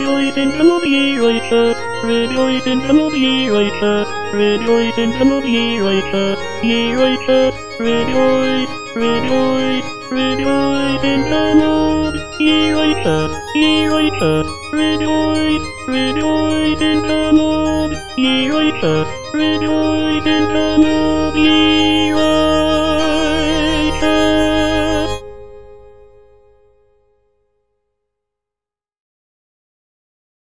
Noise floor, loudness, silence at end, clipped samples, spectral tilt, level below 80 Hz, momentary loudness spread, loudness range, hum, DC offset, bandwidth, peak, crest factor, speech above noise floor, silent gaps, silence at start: -88 dBFS; -15 LUFS; 1.4 s; under 0.1%; -5 dB/octave; -36 dBFS; 6 LU; 3 LU; none; 4%; 10.5 kHz; -2 dBFS; 14 dB; 74 dB; none; 0 s